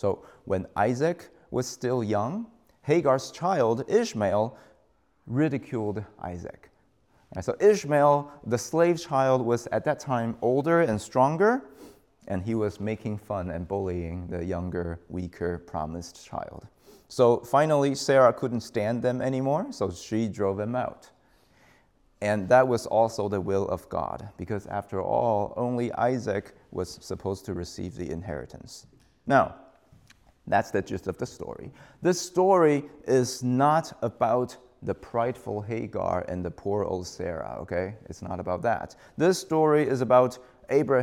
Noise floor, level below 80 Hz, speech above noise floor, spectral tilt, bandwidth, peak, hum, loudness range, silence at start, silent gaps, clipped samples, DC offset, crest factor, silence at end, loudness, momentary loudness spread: -66 dBFS; -58 dBFS; 40 dB; -6 dB/octave; 16.5 kHz; -6 dBFS; none; 7 LU; 0.05 s; none; under 0.1%; under 0.1%; 20 dB; 0 s; -27 LUFS; 15 LU